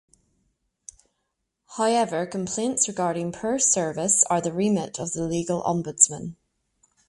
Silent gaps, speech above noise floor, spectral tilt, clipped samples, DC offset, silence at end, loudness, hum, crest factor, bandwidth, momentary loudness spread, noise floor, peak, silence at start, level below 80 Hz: none; 54 dB; -3.5 dB/octave; under 0.1%; under 0.1%; 0.75 s; -23 LUFS; none; 24 dB; 11.5 kHz; 10 LU; -78 dBFS; -2 dBFS; 1.7 s; -60 dBFS